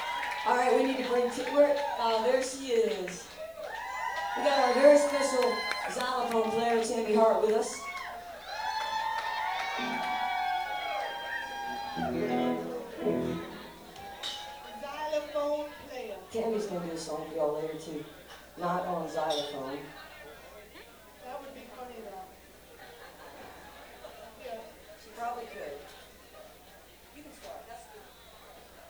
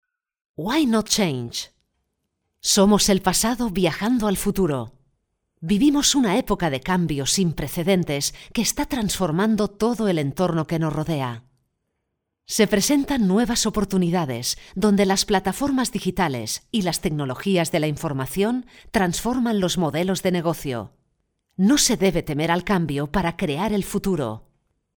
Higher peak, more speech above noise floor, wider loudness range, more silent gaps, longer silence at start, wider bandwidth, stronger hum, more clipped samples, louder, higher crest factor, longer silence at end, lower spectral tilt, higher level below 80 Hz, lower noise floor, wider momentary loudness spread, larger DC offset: second, -10 dBFS vs -4 dBFS; second, 26 dB vs 57 dB; first, 19 LU vs 3 LU; neither; second, 0 s vs 0.6 s; about the same, over 20 kHz vs over 20 kHz; neither; neither; second, -30 LUFS vs -22 LUFS; about the same, 22 dB vs 18 dB; second, 0 s vs 0.55 s; about the same, -3.5 dB/octave vs -4.5 dB/octave; second, -64 dBFS vs -44 dBFS; second, -54 dBFS vs -78 dBFS; first, 23 LU vs 9 LU; neither